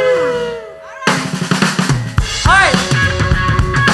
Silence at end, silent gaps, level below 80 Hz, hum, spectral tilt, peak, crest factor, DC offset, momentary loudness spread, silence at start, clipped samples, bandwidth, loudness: 0 s; none; -24 dBFS; none; -4.5 dB/octave; 0 dBFS; 14 dB; under 0.1%; 10 LU; 0 s; under 0.1%; 12.5 kHz; -14 LUFS